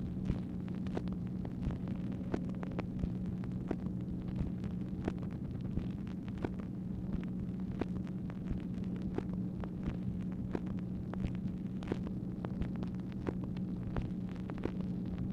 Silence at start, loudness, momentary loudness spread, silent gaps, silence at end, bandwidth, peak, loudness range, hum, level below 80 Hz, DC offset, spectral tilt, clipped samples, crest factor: 0 s; -40 LUFS; 2 LU; none; 0 s; 7.2 kHz; -18 dBFS; 1 LU; none; -48 dBFS; under 0.1%; -9.5 dB/octave; under 0.1%; 20 dB